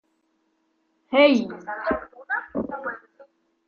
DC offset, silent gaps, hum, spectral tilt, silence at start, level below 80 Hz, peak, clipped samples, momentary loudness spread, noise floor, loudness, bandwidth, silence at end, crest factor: under 0.1%; none; none; -5.5 dB/octave; 1.1 s; -58 dBFS; -4 dBFS; under 0.1%; 16 LU; -70 dBFS; -24 LUFS; 6.8 kHz; 0.45 s; 22 dB